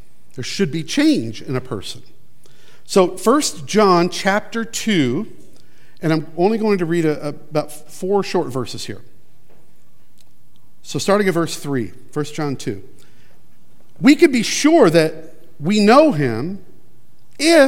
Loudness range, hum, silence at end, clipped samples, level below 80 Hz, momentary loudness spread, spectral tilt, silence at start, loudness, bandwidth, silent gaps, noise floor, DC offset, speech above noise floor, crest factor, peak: 9 LU; none; 0 s; under 0.1%; -62 dBFS; 17 LU; -5 dB/octave; 0.35 s; -18 LUFS; 16.5 kHz; none; -57 dBFS; 3%; 40 dB; 18 dB; 0 dBFS